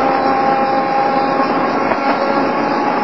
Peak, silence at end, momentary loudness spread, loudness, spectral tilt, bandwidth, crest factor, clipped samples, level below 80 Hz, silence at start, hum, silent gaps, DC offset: 0 dBFS; 0 s; 2 LU; -15 LUFS; -6.5 dB/octave; 7.2 kHz; 14 dB; under 0.1%; -60 dBFS; 0 s; none; none; 0.8%